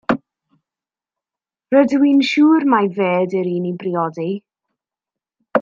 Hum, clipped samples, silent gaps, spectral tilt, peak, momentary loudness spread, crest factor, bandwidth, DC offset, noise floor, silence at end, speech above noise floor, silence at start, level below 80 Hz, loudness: none; under 0.1%; none; -7 dB/octave; -2 dBFS; 10 LU; 16 dB; 7.4 kHz; under 0.1%; -89 dBFS; 0 s; 74 dB; 0.1 s; -64 dBFS; -17 LUFS